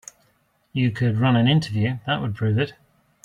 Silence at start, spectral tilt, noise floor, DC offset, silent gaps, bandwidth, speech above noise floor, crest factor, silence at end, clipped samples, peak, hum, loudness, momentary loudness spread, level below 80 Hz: 0.75 s; -7 dB/octave; -65 dBFS; under 0.1%; none; 10 kHz; 44 dB; 16 dB; 0.55 s; under 0.1%; -6 dBFS; none; -22 LUFS; 7 LU; -56 dBFS